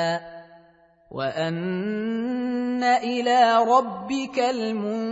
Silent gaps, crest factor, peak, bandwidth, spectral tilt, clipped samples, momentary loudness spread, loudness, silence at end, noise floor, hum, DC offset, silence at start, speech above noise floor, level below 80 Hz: none; 18 dB; -6 dBFS; 8 kHz; -5.5 dB/octave; under 0.1%; 11 LU; -23 LUFS; 0 s; -56 dBFS; none; under 0.1%; 0 s; 33 dB; -66 dBFS